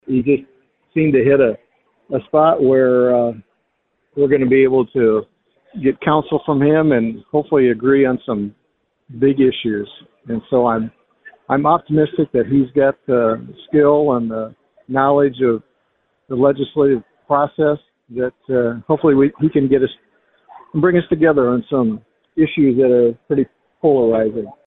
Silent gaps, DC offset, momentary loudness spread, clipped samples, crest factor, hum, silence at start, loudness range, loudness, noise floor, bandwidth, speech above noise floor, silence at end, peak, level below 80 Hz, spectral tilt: none; under 0.1%; 12 LU; under 0.1%; 16 dB; none; 0.1 s; 3 LU; -16 LUFS; -68 dBFS; 4 kHz; 53 dB; 0.15 s; -2 dBFS; -52 dBFS; -11.5 dB/octave